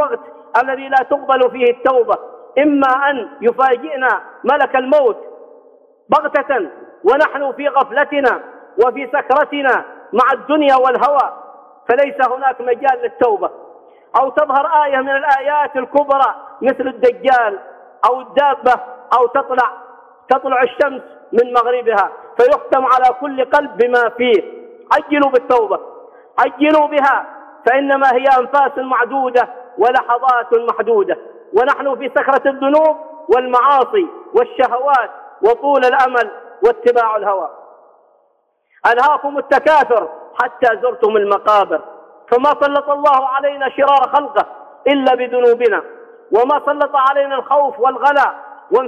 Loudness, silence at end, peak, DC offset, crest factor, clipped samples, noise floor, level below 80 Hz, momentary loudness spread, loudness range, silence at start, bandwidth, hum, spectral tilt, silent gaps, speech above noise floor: -14 LUFS; 0 s; -2 dBFS; under 0.1%; 14 dB; under 0.1%; -61 dBFS; -60 dBFS; 7 LU; 2 LU; 0 s; 8 kHz; none; -5 dB/octave; none; 47 dB